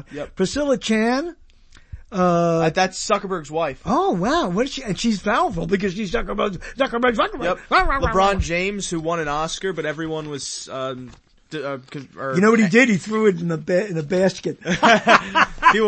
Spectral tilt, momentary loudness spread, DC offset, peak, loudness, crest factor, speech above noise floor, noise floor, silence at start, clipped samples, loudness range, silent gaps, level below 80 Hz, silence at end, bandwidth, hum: -5 dB/octave; 13 LU; under 0.1%; 0 dBFS; -20 LUFS; 20 dB; 28 dB; -48 dBFS; 0.1 s; under 0.1%; 6 LU; none; -38 dBFS; 0 s; 8.8 kHz; none